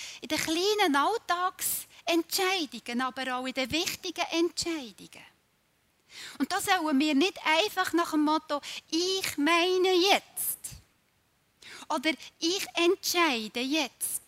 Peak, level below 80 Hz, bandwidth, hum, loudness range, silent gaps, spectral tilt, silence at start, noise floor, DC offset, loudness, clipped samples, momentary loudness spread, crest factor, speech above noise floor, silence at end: -6 dBFS; -66 dBFS; 16 kHz; none; 6 LU; none; -1.5 dB/octave; 0 s; -70 dBFS; under 0.1%; -28 LUFS; under 0.1%; 10 LU; 22 dB; 42 dB; 0.1 s